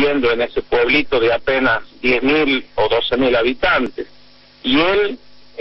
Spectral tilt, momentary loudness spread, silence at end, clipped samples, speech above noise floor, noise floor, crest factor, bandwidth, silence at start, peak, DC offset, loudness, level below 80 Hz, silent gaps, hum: -7 dB/octave; 8 LU; 0 s; under 0.1%; 31 dB; -47 dBFS; 14 dB; 6 kHz; 0 s; -4 dBFS; under 0.1%; -16 LUFS; -40 dBFS; none; none